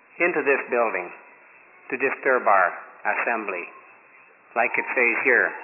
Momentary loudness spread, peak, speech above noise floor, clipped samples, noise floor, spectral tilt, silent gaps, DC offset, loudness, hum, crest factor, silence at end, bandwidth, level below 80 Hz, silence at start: 12 LU; -6 dBFS; 30 dB; under 0.1%; -53 dBFS; -8.5 dB/octave; none; under 0.1%; -22 LUFS; none; 18 dB; 0 s; 2.9 kHz; -90 dBFS; 0.15 s